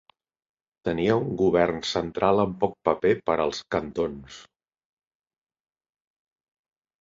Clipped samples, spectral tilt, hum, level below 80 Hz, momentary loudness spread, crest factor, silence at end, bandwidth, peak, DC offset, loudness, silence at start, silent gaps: under 0.1%; -6 dB/octave; none; -54 dBFS; 8 LU; 22 dB; 2.6 s; 7.8 kHz; -6 dBFS; under 0.1%; -25 LUFS; 0.85 s; none